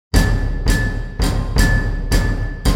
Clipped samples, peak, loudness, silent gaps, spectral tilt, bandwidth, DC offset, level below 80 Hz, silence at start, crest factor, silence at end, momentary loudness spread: under 0.1%; 0 dBFS; -19 LUFS; none; -5 dB/octave; 16 kHz; under 0.1%; -18 dBFS; 0.15 s; 16 dB; 0 s; 5 LU